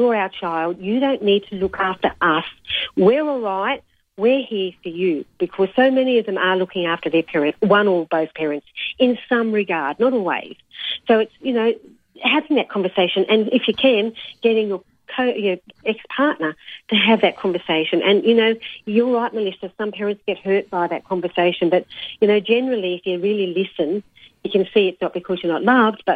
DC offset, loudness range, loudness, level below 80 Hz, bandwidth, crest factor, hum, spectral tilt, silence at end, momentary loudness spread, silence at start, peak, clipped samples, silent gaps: under 0.1%; 2 LU; -19 LUFS; -60 dBFS; 4.9 kHz; 16 dB; none; -7.5 dB/octave; 0 s; 10 LU; 0 s; -4 dBFS; under 0.1%; none